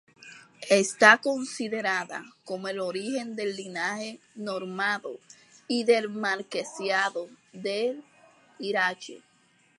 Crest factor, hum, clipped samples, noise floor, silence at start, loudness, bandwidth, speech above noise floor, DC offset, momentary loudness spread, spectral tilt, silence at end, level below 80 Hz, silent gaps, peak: 28 dB; none; under 0.1%; -64 dBFS; 0.2 s; -26 LUFS; 11.5 kHz; 37 dB; under 0.1%; 18 LU; -3 dB/octave; 0.6 s; -84 dBFS; none; -2 dBFS